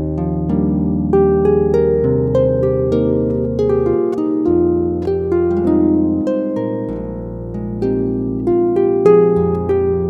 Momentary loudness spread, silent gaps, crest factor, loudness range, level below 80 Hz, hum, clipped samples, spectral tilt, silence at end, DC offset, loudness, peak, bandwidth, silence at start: 8 LU; none; 14 dB; 3 LU; -32 dBFS; none; under 0.1%; -11 dB/octave; 0 s; under 0.1%; -16 LUFS; 0 dBFS; 5.8 kHz; 0 s